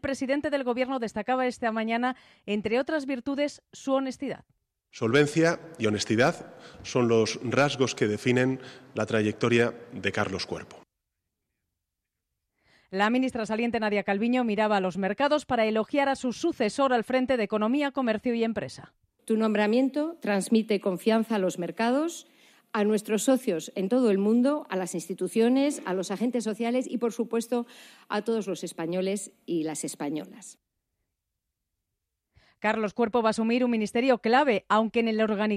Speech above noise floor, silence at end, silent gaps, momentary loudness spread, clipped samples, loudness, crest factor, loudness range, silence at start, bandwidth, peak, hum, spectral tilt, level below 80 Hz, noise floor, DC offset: 58 dB; 0 s; none; 10 LU; under 0.1%; -27 LUFS; 16 dB; 6 LU; 0.05 s; 15 kHz; -10 dBFS; none; -5 dB/octave; -66 dBFS; -85 dBFS; under 0.1%